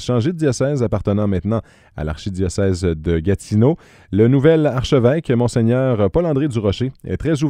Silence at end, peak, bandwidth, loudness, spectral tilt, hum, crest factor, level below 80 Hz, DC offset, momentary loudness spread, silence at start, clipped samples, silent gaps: 0 s; 0 dBFS; 11.5 kHz; -18 LUFS; -7.5 dB/octave; none; 16 dB; -36 dBFS; under 0.1%; 9 LU; 0 s; under 0.1%; none